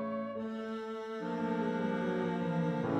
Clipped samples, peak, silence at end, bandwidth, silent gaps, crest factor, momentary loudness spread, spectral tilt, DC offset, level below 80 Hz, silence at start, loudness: under 0.1%; -22 dBFS; 0 s; 8.4 kHz; none; 12 dB; 6 LU; -8 dB/octave; under 0.1%; -70 dBFS; 0 s; -36 LUFS